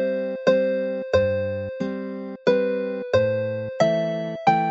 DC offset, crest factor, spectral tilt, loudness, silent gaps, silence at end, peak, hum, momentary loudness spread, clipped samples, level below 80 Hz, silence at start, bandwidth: under 0.1%; 18 dB; -6.5 dB/octave; -23 LUFS; none; 0 s; -4 dBFS; none; 8 LU; under 0.1%; -56 dBFS; 0 s; 7.8 kHz